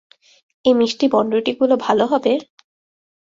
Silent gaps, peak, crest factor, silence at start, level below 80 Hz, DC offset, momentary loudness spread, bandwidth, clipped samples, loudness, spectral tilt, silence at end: none; -2 dBFS; 18 dB; 0.65 s; -64 dBFS; under 0.1%; 4 LU; 7.8 kHz; under 0.1%; -18 LUFS; -5 dB/octave; 0.9 s